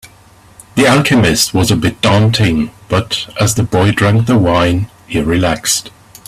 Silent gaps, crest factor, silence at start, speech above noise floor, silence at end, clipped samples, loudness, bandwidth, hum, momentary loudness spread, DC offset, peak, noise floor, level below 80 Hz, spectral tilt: none; 12 dB; 0.05 s; 31 dB; 0.4 s; under 0.1%; -12 LUFS; 15.5 kHz; none; 8 LU; under 0.1%; 0 dBFS; -43 dBFS; -36 dBFS; -4.5 dB/octave